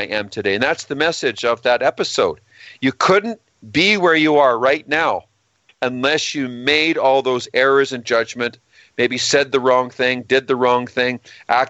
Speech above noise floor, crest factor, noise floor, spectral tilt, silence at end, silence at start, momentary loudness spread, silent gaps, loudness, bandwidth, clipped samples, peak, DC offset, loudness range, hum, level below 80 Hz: 41 dB; 18 dB; -59 dBFS; -3.5 dB/octave; 0 s; 0 s; 9 LU; none; -17 LUFS; 8.4 kHz; under 0.1%; 0 dBFS; under 0.1%; 2 LU; none; -60 dBFS